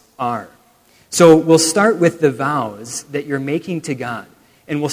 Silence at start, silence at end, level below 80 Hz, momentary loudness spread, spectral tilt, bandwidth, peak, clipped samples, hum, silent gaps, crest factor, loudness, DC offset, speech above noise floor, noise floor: 0.2 s; 0 s; -58 dBFS; 16 LU; -4.5 dB/octave; 16 kHz; 0 dBFS; under 0.1%; none; none; 16 dB; -16 LUFS; under 0.1%; 37 dB; -53 dBFS